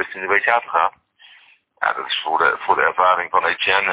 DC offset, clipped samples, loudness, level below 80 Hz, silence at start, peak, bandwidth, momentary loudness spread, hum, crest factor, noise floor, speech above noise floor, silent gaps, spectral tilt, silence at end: under 0.1%; under 0.1%; -18 LUFS; -60 dBFS; 0 s; -2 dBFS; 4 kHz; 6 LU; none; 18 dB; -52 dBFS; 33 dB; none; -5.5 dB/octave; 0 s